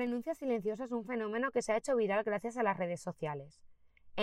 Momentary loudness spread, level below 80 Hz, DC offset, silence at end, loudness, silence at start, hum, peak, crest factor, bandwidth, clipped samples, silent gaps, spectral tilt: 9 LU; -70 dBFS; under 0.1%; 0 s; -36 LUFS; 0 s; none; -20 dBFS; 16 dB; 14 kHz; under 0.1%; none; -5.5 dB/octave